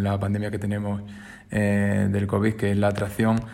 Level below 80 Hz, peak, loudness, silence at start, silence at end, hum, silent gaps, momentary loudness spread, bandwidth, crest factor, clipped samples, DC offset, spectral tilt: -50 dBFS; -8 dBFS; -24 LUFS; 0 s; 0 s; none; none; 8 LU; 16 kHz; 16 dB; under 0.1%; under 0.1%; -7.5 dB/octave